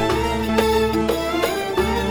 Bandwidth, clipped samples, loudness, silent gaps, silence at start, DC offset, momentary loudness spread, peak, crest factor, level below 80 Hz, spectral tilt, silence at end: over 20 kHz; under 0.1%; -20 LUFS; none; 0 s; under 0.1%; 3 LU; -4 dBFS; 16 dB; -32 dBFS; -5 dB/octave; 0 s